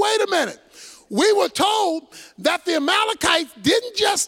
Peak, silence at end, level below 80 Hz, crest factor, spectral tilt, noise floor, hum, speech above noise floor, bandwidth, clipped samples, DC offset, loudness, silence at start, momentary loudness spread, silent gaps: -2 dBFS; 0 s; -56 dBFS; 18 dB; -2 dB/octave; -45 dBFS; none; 25 dB; 17 kHz; under 0.1%; under 0.1%; -20 LUFS; 0 s; 8 LU; none